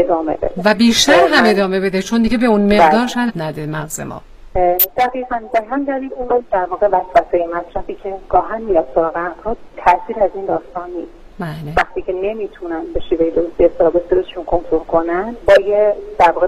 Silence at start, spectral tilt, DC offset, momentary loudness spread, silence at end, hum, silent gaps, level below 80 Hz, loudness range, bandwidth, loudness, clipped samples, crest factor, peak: 0 s; -4.5 dB/octave; under 0.1%; 15 LU; 0 s; none; none; -36 dBFS; 7 LU; 16 kHz; -16 LUFS; under 0.1%; 16 dB; 0 dBFS